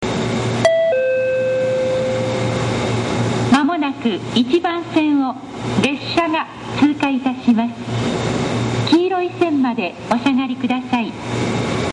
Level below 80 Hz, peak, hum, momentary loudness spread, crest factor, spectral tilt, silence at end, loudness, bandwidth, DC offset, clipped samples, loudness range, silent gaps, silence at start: -46 dBFS; -4 dBFS; none; 6 LU; 14 dB; -6 dB/octave; 0 s; -18 LUFS; 10.5 kHz; under 0.1%; under 0.1%; 1 LU; none; 0 s